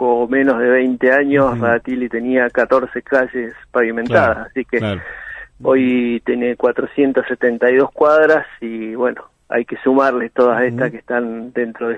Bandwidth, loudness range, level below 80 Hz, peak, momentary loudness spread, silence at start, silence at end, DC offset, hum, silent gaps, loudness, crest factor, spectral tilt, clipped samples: 7.4 kHz; 3 LU; -50 dBFS; 0 dBFS; 9 LU; 0 s; 0 s; under 0.1%; none; none; -16 LUFS; 16 dB; -8 dB/octave; under 0.1%